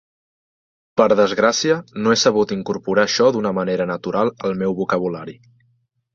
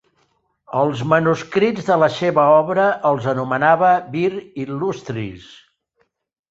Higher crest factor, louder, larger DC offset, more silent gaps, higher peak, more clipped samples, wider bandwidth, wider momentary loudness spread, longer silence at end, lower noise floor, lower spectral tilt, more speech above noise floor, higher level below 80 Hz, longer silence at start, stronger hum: about the same, 18 dB vs 16 dB; about the same, -18 LUFS vs -18 LUFS; neither; neither; about the same, -2 dBFS vs -2 dBFS; neither; about the same, 7.6 kHz vs 7.8 kHz; second, 8 LU vs 13 LU; second, 0.8 s vs 1.1 s; about the same, -64 dBFS vs -67 dBFS; second, -4.5 dB/octave vs -6.5 dB/octave; about the same, 46 dB vs 49 dB; about the same, -58 dBFS vs -58 dBFS; first, 0.95 s vs 0.7 s; neither